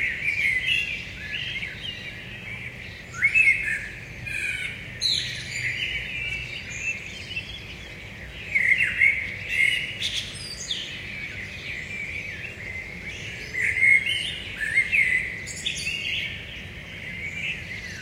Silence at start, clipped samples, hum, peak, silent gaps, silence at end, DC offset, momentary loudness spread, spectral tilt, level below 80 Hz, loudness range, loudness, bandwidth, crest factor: 0 s; under 0.1%; none; -8 dBFS; none; 0 s; under 0.1%; 16 LU; -1.5 dB/octave; -48 dBFS; 7 LU; -24 LUFS; 16 kHz; 20 dB